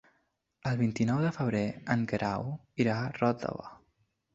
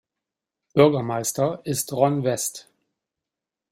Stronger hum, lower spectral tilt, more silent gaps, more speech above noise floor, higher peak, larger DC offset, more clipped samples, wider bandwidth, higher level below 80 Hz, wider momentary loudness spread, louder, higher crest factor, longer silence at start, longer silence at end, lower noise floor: neither; first, -7.5 dB/octave vs -5 dB/octave; neither; second, 46 dB vs 66 dB; second, -10 dBFS vs -2 dBFS; neither; neither; second, 7.8 kHz vs 16 kHz; about the same, -62 dBFS vs -64 dBFS; about the same, 10 LU vs 9 LU; second, -31 LUFS vs -22 LUFS; about the same, 20 dB vs 22 dB; about the same, 0.65 s vs 0.75 s; second, 0.6 s vs 1.1 s; second, -76 dBFS vs -87 dBFS